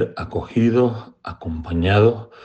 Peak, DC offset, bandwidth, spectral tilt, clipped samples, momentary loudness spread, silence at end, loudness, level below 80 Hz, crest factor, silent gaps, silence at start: -2 dBFS; under 0.1%; 7 kHz; -8.5 dB/octave; under 0.1%; 17 LU; 0 s; -19 LUFS; -40 dBFS; 18 dB; none; 0 s